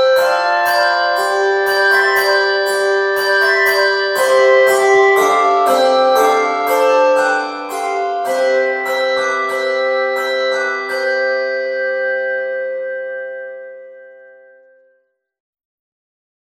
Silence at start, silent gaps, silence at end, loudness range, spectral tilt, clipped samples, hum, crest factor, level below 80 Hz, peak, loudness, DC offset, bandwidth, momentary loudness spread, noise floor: 0 s; none; 2.45 s; 11 LU; -1 dB/octave; under 0.1%; none; 14 dB; -70 dBFS; 0 dBFS; -14 LUFS; under 0.1%; 17 kHz; 10 LU; -62 dBFS